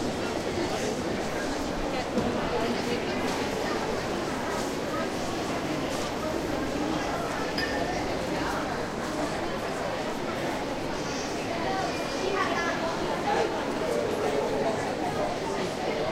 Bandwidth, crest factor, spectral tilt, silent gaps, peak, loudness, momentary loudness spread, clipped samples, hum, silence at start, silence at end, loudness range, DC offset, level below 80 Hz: 16 kHz; 16 dB; -4.5 dB/octave; none; -12 dBFS; -29 LUFS; 3 LU; under 0.1%; none; 0 s; 0 s; 2 LU; under 0.1%; -46 dBFS